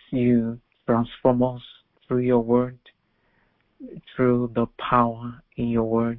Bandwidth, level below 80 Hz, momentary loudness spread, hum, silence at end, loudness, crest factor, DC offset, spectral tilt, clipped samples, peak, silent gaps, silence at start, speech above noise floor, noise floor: 4 kHz; -50 dBFS; 15 LU; none; 0 s; -23 LUFS; 20 dB; under 0.1%; -12 dB/octave; under 0.1%; -4 dBFS; none; 0.1 s; 44 dB; -67 dBFS